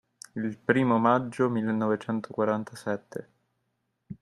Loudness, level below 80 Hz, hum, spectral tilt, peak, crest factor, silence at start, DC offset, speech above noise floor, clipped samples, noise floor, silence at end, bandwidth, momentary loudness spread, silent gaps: -27 LUFS; -70 dBFS; none; -7 dB/octave; -6 dBFS; 22 dB; 0.35 s; under 0.1%; 51 dB; under 0.1%; -78 dBFS; 0.05 s; 12 kHz; 17 LU; none